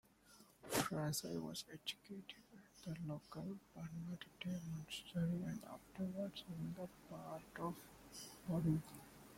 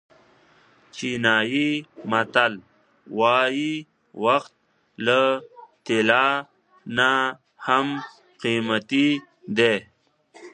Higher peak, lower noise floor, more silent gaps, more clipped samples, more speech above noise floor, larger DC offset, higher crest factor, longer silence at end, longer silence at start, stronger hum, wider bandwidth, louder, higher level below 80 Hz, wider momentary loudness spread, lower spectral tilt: second, -24 dBFS vs -2 dBFS; first, -68 dBFS vs -57 dBFS; neither; neither; second, 21 dB vs 35 dB; neither; about the same, 22 dB vs 22 dB; about the same, 0 s vs 0.05 s; second, 0.25 s vs 0.95 s; neither; first, 16.5 kHz vs 9.8 kHz; second, -46 LUFS vs -22 LUFS; about the same, -72 dBFS vs -68 dBFS; about the same, 15 LU vs 13 LU; about the same, -5 dB/octave vs -4.5 dB/octave